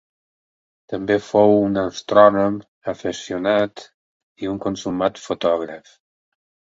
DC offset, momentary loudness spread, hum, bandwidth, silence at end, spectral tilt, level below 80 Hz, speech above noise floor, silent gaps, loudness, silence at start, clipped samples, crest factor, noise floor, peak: under 0.1%; 15 LU; none; 7.8 kHz; 1 s; -6 dB/octave; -56 dBFS; over 71 dB; 2.68-2.81 s, 3.94-4.35 s; -19 LUFS; 0.9 s; under 0.1%; 20 dB; under -90 dBFS; 0 dBFS